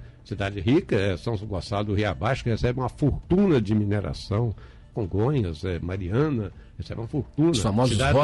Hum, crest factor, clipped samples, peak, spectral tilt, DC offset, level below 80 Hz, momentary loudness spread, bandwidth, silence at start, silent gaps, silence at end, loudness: none; 12 dB; under 0.1%; -12 dBFS; -6.5 dB/octave; under 0.1%; -40 dBFS; 10 LU; 11.5 kHz; 0 s; none; 0 s; -25 LUFS